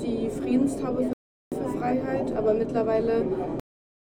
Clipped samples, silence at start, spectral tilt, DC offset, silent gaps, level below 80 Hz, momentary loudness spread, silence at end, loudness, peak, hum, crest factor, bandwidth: under 0.1%; 0 s; -7.5 dB/octave; under 0.1%; 1.13-1.51 s; -50 dBFS; 9 LU; 0.5 s; -27 LUFS; -12 dBFS; none; 16 dB; 13.5 kHz